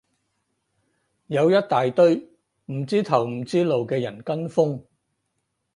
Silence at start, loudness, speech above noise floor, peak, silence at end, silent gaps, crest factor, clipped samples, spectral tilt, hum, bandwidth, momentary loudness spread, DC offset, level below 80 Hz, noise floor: 1.3 s; -22 LUFS; 55 dB; -4 dBFS; 0.95 s; none; 20 dB; under 0.1%; -7 dB/octave; none; 11 kHz; 10 LU; under 0.1%; -68 dBFS; -76 dBFS